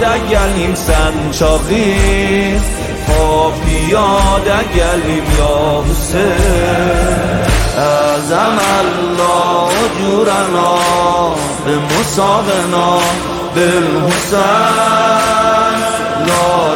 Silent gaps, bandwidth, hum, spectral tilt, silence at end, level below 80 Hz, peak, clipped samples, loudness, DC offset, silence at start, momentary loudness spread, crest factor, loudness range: none; 17 kHz; none; -4.5 dB/octave; 0 s; -20 dBFS; 0 dBFS; under 0.1%; -12 LUFS; under 0.1%; 0 s; 4 LU; 12 dB; 1 LU